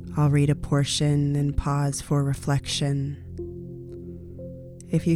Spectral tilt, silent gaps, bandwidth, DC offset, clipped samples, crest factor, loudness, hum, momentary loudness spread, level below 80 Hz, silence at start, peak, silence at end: -6 dB/octave; none; 13 kHz; under 0.1%; under 0.1%; 14 dB; -24 LUFS; none; 17 LU; -40 dBFS; 0 s; -10 dBFS; 0 s